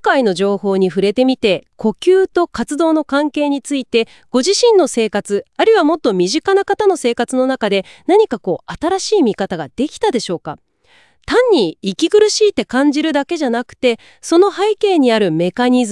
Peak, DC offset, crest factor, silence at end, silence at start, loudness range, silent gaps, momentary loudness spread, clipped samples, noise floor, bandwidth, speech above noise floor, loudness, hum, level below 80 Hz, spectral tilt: 0 dBFS; 0.2%; 14 dB; 0 s; 0.05 s; 3 LU; none; 8 LU; under 0.1%; -53 dBFS; 12 kHz; 38 dB; -15 LUFS; none; -52 dBFS; -4.5 dB/octave